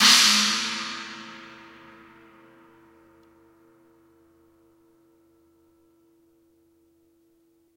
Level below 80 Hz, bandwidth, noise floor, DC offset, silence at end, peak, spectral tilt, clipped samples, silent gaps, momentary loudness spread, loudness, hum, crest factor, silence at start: -72 dBFS; 16 kHz; -64 dBFS; under 0.1%; 6.3 s; -2 dBFS; 1 dB/octave; under 0.1%; none; 31 LU; -19 LUFS; none; 28 dB; 0 s